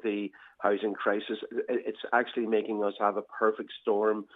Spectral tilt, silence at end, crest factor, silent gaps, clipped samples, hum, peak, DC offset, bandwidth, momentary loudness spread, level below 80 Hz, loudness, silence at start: -7.5 dB/octave; 0.1 s; 20 dB; none; under 0.1%; none; -10 dBFS; under 0.1%; 4 kHz; 6 LU; -84 dBFS; -30 LUFS; 0.05 s